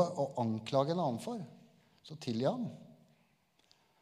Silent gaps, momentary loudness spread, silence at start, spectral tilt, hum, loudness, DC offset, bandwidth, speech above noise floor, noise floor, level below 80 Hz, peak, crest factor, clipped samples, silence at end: none; 16 LU; 0 s; -7 dB/octave; none; -36 LUFS; under 0.1%; 14.5 kHz; 38 dB; -72 dBFS; -82 dBFS; -16 dBFS; 22 dB; under 0.1%; 1.1 s